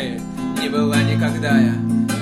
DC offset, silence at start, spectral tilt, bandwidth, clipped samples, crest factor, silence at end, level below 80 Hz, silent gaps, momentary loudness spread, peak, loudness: under 0.1%; 0 s; -6 dB/octave; 14.5 kHz; under 0.1%; 14 dB; 0 s; -48 dBFS; none; 9 LU; -4 dBFS; -19 LUFS